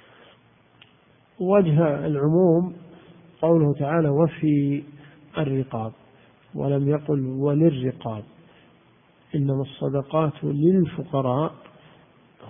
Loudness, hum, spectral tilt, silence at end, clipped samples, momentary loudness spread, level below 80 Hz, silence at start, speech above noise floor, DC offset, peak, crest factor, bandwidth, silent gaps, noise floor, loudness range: -23 LUFS; none; -13 dB/octave; 0 s; under 0.1%; 12 LU; -58 dBFS; 1.4 s; 36 dB; under 0.1%; -6 dBFS; 18 dB; 3.7 kHz; none; -58 dBFS; 4 LU